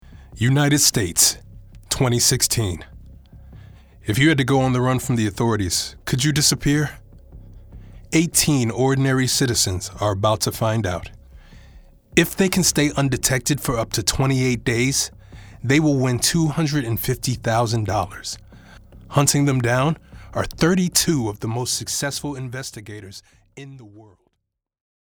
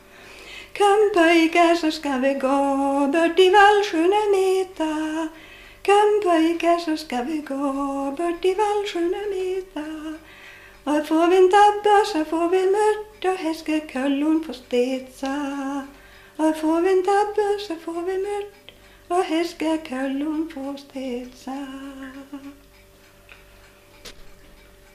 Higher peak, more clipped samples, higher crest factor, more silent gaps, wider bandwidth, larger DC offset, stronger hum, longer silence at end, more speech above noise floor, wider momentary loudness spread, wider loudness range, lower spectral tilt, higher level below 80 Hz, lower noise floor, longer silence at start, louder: first, 0 dBFS vs -4 dBFS; neither; first, 22 dB vs 16 dB; neither; first, over 20 kHz vs 15 kHz; neither; second, none vs 50 Hz at -60 dBFS; first, 1.05 s vs 0.6 s; first, 57 dB vs 30 dB; second, 14 LU vs 17 LU; second, 3 LU vs 11 LU; about the same, -4 dB/octave vs -3 dB/octave; first, -42 dBFS vs -54 dBFS; first, -77 dBFS vs -51 dBFS; about the same, 0.1 s vs 0.2 s; about the same, -19 LUFS vs -21 LUFS